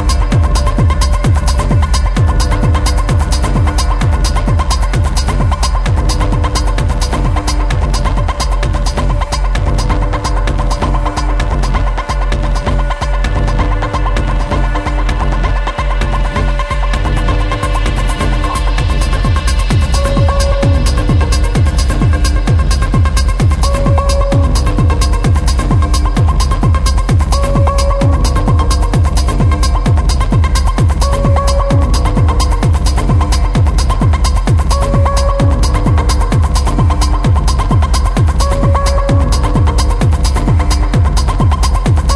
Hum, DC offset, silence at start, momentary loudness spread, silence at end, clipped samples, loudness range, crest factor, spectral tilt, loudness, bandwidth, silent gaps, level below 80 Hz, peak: none; under 0.1%; 0 s; 4 LU; 0 s; under 0.1%; 3 LU; 10 dB; -5.5 dB/octave; -13 LUFS; 11 kHz; none; -12 dBFS; 0 dBFS